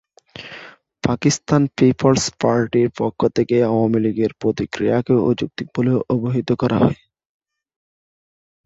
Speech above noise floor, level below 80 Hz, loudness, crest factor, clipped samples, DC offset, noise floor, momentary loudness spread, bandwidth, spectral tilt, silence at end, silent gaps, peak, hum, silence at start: 23 dB; -50 dBFS; -18 LUFS; 18 dB; under 0.1%; under 0.1%; -41 dBFS; 9 LU; 8 kHz; -6 dB/octave; 1.7 s; none; -2 dBFS; none; 0.35 s